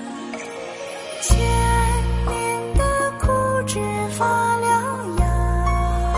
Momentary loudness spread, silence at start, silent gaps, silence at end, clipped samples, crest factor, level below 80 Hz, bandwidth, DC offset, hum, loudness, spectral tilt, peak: 12 LU; 0 s; none; 0 s; under 0.1%; 18 dB; -24 dBFS; 11.5 kHz; under 0.1%; none; -21 LUFS; -5 dB/octave; -2 dBFS